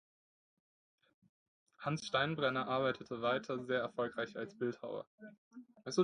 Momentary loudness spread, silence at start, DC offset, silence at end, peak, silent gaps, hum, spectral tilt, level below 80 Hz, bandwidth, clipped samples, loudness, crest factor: 20 LU; 1.8 s; under 0.1%; 0 s; -18 dBFS; 5.07-5.18 s, 5.38-5.51 s; none; -5 dB/octave; -76 dBFS; 10 kHz; under 0.1%; -38 LUFS; 20 dB